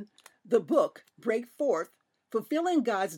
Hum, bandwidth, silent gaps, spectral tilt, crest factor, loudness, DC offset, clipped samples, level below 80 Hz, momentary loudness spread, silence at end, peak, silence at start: none; 17.5 kHz; none; -5 dB/octave; 18 dB; -29 LUFS; under 0.1%; under 0.1%; under -90 dBFS; 10 LU; 0 s; -12 dBFS; 0 s